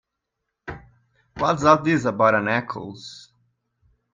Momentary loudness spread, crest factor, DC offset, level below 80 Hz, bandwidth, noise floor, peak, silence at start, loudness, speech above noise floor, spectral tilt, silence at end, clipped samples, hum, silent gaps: 22 LU; 22 dB; under 0.1%; -56 dBFS; 9.2 kHz; -80 dBFS; -2 dBFS; 0.65 s; -20 LUFS; 60 dB; -6 dB/octave; 0.95 s; under 0.1%; none; none